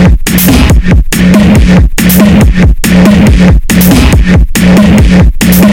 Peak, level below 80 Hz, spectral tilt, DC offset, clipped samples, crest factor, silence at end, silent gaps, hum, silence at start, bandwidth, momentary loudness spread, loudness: 0 dBFS; -8 dBFS; -6 dB/octave; 1%; 7%; 4 dB; 0 s; none; none; 0 s; 17.5 kHz; 3 LU; -5 LUFS